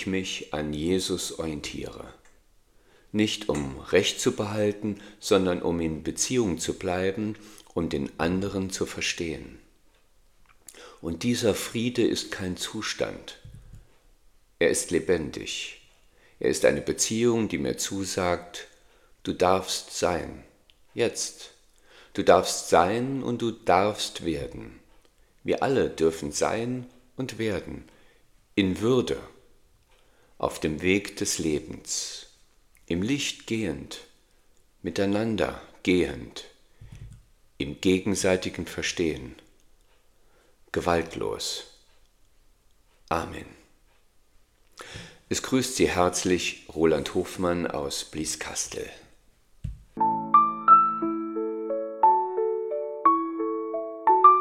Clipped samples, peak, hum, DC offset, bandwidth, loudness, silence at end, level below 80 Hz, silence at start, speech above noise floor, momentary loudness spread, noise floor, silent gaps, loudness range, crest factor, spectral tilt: under 0.1%; -2 dBFS; none; under 0.1%; 16.5 kHz; -26 LUFS; 0 s; -54 dBFS; 0 s; 33 dB; 16 LU; -60 dBFS; none; 8 LU; 26 dB; -4 dB/octave